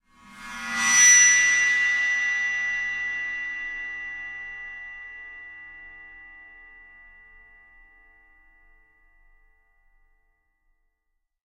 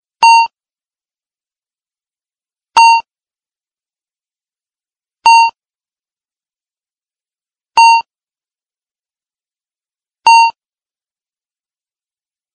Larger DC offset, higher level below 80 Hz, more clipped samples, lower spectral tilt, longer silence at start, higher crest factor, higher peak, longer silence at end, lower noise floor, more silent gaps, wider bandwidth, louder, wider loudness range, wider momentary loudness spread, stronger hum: neither; first, -58 dBFS vs -66 dBFS; neither; about the same, 3 dB/octave vs 2.5 dB/octave; about the same, 0.3 s vs 0.2 s; first, 22 dB vs 16 dB; second, -6 dBFS vs 0 dBFS; first, 5.05 s vs 2.05 s; second, -77 dBFS vs under -90 dBFS; second, none vs 8.91-8.95 s; first, 16 kHz vs 8.8 kHz; second, -19 LUFS vs -9 LUFS; first, 24 LU vs 3 LU; first, 28 LU vs 7 LU; neither